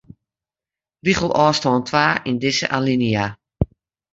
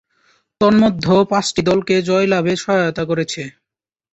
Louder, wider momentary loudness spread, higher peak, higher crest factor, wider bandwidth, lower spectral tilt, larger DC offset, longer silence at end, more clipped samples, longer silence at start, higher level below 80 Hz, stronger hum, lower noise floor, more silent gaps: second, -19 LUFS vs -16 LUFS; first, 10 LU vs 7 LU; about the same, -2 dBFS vs -2 dBFS; first, 20 dB vs 14 dB; about the same, 8 kHz vs 8.2 kHz; about the same, -5 dB/octave vs -5.5 dB/octave; neither; second, 0.5 s vs 0.65 s; neither; first, 1.05 s vs 0.6 s; first, -42 dBFS vs -50 dBFS; neither; first, under -90 dBFS vs -84 dBFS; neither